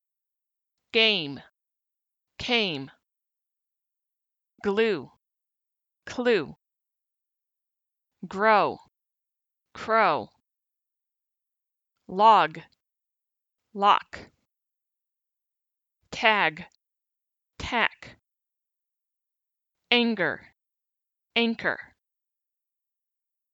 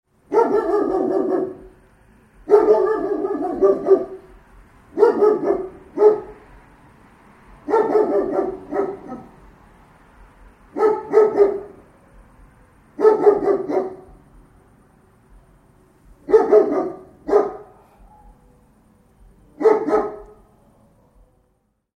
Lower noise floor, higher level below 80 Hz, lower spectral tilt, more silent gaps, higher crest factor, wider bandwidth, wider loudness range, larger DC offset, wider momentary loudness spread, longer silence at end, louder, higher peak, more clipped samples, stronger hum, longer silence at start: first, -87 dBFS vs -66 dBFS; second, -62 dBFS vs -52 dBFS; second, -4.5 dB/octave vs -7.5 dB/octave; neither; about the same, 24 dB vs 20 dB; first, 8 kHz vs 6.4 kHz; about the same, 7 LU vs 6 LU; neither; about the same, 22 LU vs 20 LU; about the same, 1.75 s vs 1.7 s; second, -24 LUFS vs -18 LUFS; second, -6 dBFS vs 0 dBFS; neither; neither; first, 0.95 s vs 0.3 s